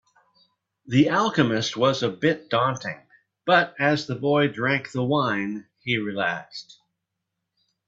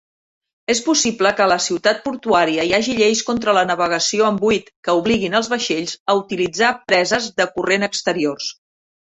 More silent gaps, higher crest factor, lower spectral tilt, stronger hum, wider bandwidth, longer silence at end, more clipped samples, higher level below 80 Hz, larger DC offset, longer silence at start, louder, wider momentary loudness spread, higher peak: second, none vs 4.76-4.83 s, 6.00-6.06 s; about the same, 22 dB vs 18 dB; first, -5.5 dB/octave vs -3 dB/octave; neither; about the same, 7.8 kHz vs 8.4 kHz; first, 1.25 s vs 0.65 s; neither; second, -64 dBFS vs -54 dBFS; neither; first, 0.85 s vs 0.7 s; second, -23 LUFS vs -18 LUFS; first, 13 LU vs 6 LU; second, -4 dBFS vs 0 dBFS